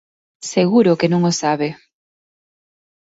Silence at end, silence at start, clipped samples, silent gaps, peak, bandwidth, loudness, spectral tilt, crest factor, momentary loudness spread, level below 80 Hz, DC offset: 1.3 s; 0.4 s; under 0.1%; none; -2 dBFS; 8 kHz; -17 LUFS; -5.5 dB/octave; 16 dB; 10 LU; -62 dBFS; under 0.1%